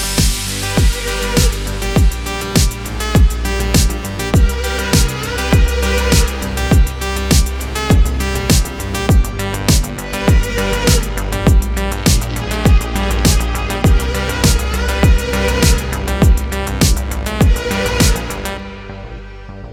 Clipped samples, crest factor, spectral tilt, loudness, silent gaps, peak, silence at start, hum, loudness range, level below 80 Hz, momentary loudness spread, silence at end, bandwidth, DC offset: under 0.1%; 14 dB; -4.5 dB/octave; -15 LUFS; none; 0 dBFS; 0 s; none; 1 LU; -16 dBFS; 7 LU; 0 s; 18 kHz; under 0.1%